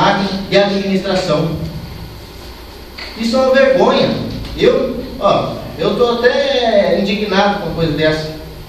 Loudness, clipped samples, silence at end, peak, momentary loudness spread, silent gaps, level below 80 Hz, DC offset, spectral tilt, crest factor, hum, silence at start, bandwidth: -14 LUFS; under 0.1%; 0 s; 0 dBFS; 18 LU; none; -36 dBFS; under 0.1%; -5.5 dB/octave; 14 dB; none; 0 s; 14 kHz